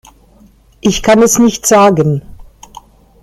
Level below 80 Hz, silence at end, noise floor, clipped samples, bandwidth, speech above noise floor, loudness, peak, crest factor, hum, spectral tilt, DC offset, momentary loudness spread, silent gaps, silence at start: -38 dBFS; 0.8 s; -45 dBFS; under 0.1%; 15.5 kHz; 36 dB; -10 LUFS; 0 dBFS; 12 dB; none; -4.5 dB/octave; under 0.1%; 8 LU; none; 0.85 s